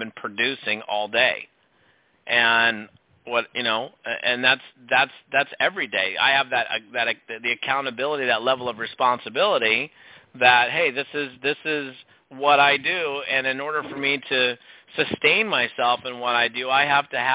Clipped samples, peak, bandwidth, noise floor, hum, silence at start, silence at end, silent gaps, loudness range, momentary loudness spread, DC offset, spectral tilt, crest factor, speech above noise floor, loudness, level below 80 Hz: under 0.1%; -2 dBFS; 4 kHz; -62 dBFS; none; 0 s; 0 s; none; 2 LU; 9 LU; under 0.1%; -6.5 dB/octave; 20 dB; 39 dB; -21 LUFS; -68 dBFS